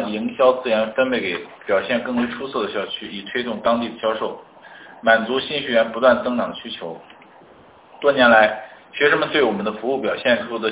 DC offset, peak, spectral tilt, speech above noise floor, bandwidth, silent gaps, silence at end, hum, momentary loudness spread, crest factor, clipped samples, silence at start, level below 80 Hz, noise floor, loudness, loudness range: under 0.1%; -2 dBFS; -8 dB/octave; 28 dB; 4 kHz; none; 0 s; none; 13 LU; 18 dB; under 0.1%; 0 s; -58 dBFS; -48 dBFS; -20 LUFS; 5 LU